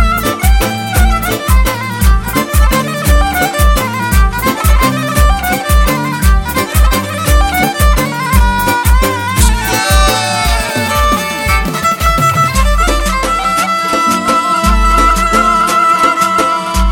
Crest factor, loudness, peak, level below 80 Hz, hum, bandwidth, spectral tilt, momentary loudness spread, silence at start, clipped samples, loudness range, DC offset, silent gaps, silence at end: 10 dB; -11 LUFS; 0 dBFS; -14 dBFS; none; 17 kHz; -4 dB/octave; 4 LU; 0 s; under 0.1%; 2 LU; under 0.1%; none; 0 s